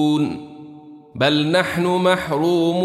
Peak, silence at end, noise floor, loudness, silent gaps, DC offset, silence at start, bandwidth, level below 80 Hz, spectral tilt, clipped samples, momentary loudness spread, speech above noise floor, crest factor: -2 dBFS; 0 s; -41 dBFS; -18 LUFS; none; under 0.1%; 0 s; 14.5 kHz; -56 dBFS; -6 dB/octave; under 0.1%; 20 LU; 23 dB; 18 dB